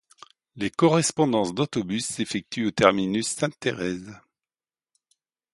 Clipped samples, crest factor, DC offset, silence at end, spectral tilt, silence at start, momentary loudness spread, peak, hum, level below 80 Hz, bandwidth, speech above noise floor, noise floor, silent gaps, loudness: under 0.1%; 24 dB; under 0.1%; 1.4 s; -4.5 dB/octave; 0.55 s; 10 LU; -2 dBFS; none; -60 dBFS; 11.5 kHz; over 66 dB; under -90 dBFS; none; -24 LUFS